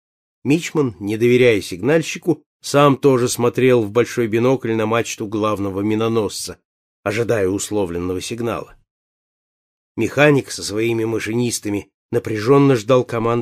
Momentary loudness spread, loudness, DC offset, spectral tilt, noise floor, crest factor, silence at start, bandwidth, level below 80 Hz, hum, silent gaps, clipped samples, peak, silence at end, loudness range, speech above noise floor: 10 LU; -18 LUFS; under 0.1%; -5.5 dB/octave; under -90 dBFS; 16 dB; 0.45 s; 15.5 kHz; -54 dBFS; none; 2.46-2.60 s, 6.65-7.03 s, 8.91-9.95 s, 11.94-12.09 s; under 0.1%; -2 dBFS; 0 s; 7 LU; over 73 dB